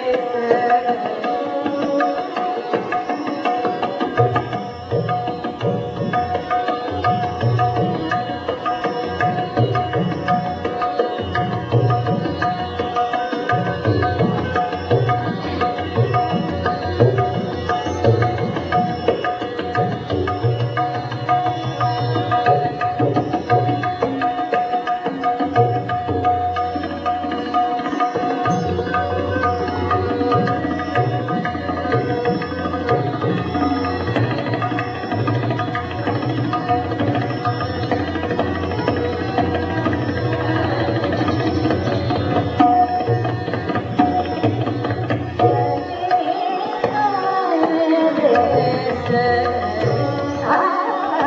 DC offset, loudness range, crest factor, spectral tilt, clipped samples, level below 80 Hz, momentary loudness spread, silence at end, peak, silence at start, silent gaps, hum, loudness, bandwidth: under 0.1%; 3 LU; 18 dB; -5.5 dB/octave; under 0.1%; -50 dBFS; 5 LU; 0 s; 0 dBFS; 0 s; none; none; -20 LUFS; 7.2 kHz